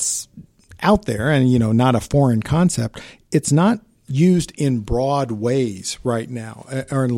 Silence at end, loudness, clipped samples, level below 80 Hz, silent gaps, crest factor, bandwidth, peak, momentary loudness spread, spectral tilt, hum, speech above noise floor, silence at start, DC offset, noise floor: 0 s; -19 LUFS; under 0.1%; -40 dBFS; none; 16 dB; 16 kHz; -2 dBFS; 11 LU; -6 dB/octave; none; 26 dB; 0 s; under 0.1%; -44 dBFS